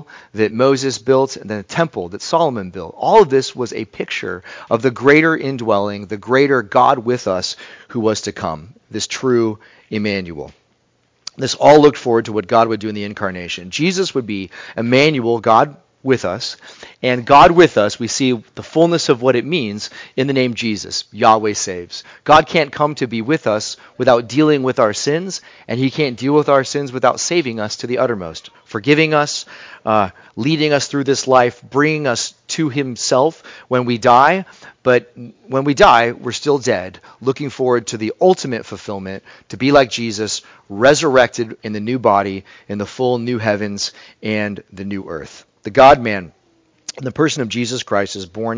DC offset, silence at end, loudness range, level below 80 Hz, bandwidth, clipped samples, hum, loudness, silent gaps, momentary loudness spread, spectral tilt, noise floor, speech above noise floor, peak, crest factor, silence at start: under 0.1%; 0 s; 4 LU; -48 dBFS; 8 kHz; 0.1%; none; -16 LUFS; none; 16 LU; -4.5 dB/octave; -61 dBFS; 45 dB; 0 dBFS; 16 dB; 0 s